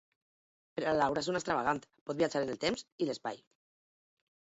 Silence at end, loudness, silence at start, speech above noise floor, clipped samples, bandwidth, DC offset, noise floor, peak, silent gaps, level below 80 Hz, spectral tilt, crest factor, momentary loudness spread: 1.15 s; -34 LUFS; 0.75 s; over 56 dB; under 0.1%; 8 kHz; under 0.1%; under -90 dBFS; -16 dBFS; 2.01-2.06 s, 2.92-2.98 s; -68 dBFS; -3.5 dB/octave; 20 dB; 11 LU